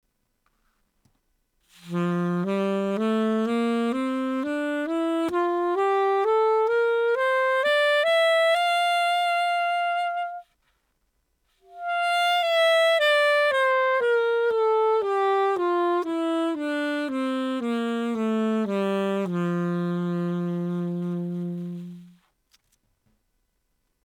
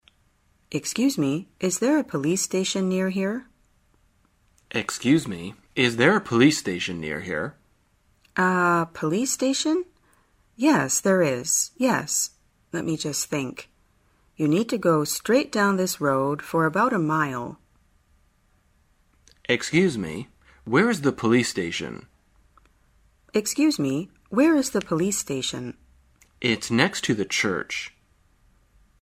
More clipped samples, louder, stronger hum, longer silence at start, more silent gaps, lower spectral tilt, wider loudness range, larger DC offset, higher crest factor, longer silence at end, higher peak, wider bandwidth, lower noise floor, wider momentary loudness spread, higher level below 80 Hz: neither; about the same, -24 LUFS vs -23 LUFS; neither; first, 1.85 s vs 0.7 s; neither; first, -5.5 dB/octave vs -4 dB/octave; first, 7 LU vs 4 LU; neither; second, 12 dB vs 24 dB; first, 1.95 s vs 1.15 s; second, -12 dBFS vs -2 dBFS; first, 19.5 kHz vs 16 kHz; first, -73 dBFS vs -64 dBFS; second, 9 LU vs 12 LU; second, -72 dBFS vs -60 dBFS